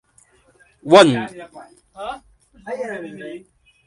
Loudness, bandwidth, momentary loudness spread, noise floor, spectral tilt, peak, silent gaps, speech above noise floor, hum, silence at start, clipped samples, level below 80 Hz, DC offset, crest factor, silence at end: -15 LUFS; 11.5 kHz; 27 LU; -56 dBFS; -5 dB/octave; 0 dBFS; none; 37 dB; none; 0.85 s; under 0.1%; -58 dBFS; under 0.1%; 20 dB; 0.5 s